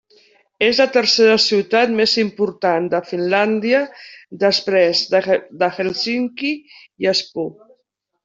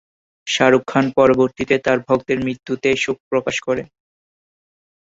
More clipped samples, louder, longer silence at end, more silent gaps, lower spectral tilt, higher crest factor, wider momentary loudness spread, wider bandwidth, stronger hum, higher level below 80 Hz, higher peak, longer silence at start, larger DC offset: neither; about the same, -17 LUFS vs -18 LUFS; second, 0.75 s vs 1.2 s; second, none vs 3.20-3.31 s; about the same, -4 dB/octave vs -5 dB/octave; about the same, 16 dB vs 18 dB; about the same, 10 LU vs 9 LU; about the same, 7.8 kHz vs 8 kHz; neither; second, -62 dBFS vs -52 dBFS; about the same, -2 dBFS vs -2 dBFS; first, 0.6 s vs 0.45 s; neither